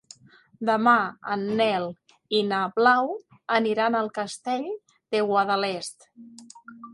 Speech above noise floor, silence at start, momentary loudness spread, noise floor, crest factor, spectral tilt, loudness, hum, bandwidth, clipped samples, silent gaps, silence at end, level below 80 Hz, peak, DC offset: 28 dB; 0.6 s; 15 LU; -52 dBFS; 20 dB; -4.5 dB/octave; -24 LUFS; none; 11.5 kHz; under 0.1%; none; 0 s; -74 dBFS; -6 dBFS; under 0.1%